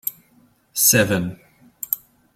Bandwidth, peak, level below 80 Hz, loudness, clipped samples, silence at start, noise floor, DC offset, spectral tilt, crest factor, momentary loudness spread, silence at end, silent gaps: 16.5 kHz; -2 dBFS; -56 dBFS; -19 LUFS; under 0.1%; 0.05 s; -57 dBFS; under 0.1%; -3 dB/octave; 22 dB; 16 LU; 0.4 s; none